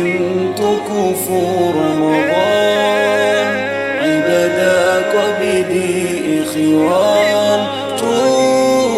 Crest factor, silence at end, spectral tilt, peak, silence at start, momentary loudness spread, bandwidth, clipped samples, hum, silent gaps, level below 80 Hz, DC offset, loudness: 12 dB; 0 s; -4.5 dB/octave; -2 dBFS; 0 s; 5 LU; 16.5 kHz; under 0.1%; none; none; -54 dBFS; under 0.1%; -14 LUFS